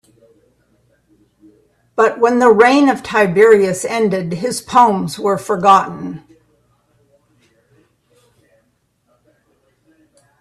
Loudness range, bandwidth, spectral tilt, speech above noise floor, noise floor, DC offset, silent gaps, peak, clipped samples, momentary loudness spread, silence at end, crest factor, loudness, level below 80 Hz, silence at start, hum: 7 LU; 13 kHz; -5 dB/octave; 50 dB; -63 dBFS; under 0.1%; none; 0 dBFS; under 0.1%; 14 LU; 4.2 s; 16 dB; -13 LUFS; -58 dBFS; 1.95 s; none